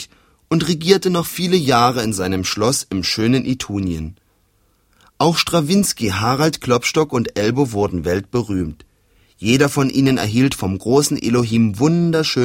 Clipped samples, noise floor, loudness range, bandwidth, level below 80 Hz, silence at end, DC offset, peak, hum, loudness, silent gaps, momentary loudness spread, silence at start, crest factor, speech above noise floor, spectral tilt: under 0.1%; -60 dBFS; 3 LU; 16.5 kHz; -44 dBFS; 0 s; under 0.1%; 0 dBFS; none; -17 LUFS; none; 7 LU; 0 s; 18 dB; 43 dB; -5 dB/octave